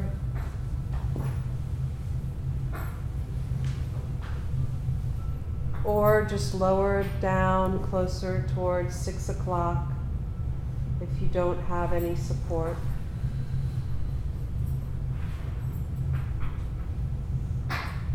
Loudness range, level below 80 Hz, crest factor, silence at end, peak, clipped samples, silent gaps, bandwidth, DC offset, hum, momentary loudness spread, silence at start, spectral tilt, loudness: 6 LU; -34 dBFS; 18 dB; 0 s; -10 dBFS; under 0.1%; none; 16 kHz; under 0.1%; none; 9 LU; 0 s; -7.5 dB/octave; -30 LUFS